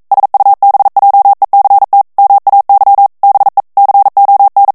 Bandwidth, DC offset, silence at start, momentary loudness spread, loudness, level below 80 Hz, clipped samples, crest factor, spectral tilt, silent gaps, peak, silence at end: 1.9 kHz; 0.1%; 0.1 s; 3 LU; -7 LUFS; -58 dBFS; under 0.1%; 6 dB; -4.5 dB/octave; none; 0 dBFS; 0.05 s